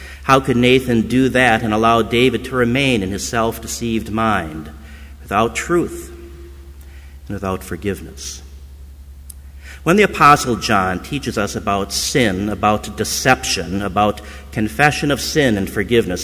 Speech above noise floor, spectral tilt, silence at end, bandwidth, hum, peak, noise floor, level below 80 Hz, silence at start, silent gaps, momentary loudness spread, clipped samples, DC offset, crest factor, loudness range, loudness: 20 dB; -4.5 dB/octave; 0 s; 16 kHz; none; 0 dBFS; -37 dBFS; -36 dBFS; 0 s; none; 18 LU; under 0.1%; under 0.1%; 18 dB; 10 LU; -17 LUFS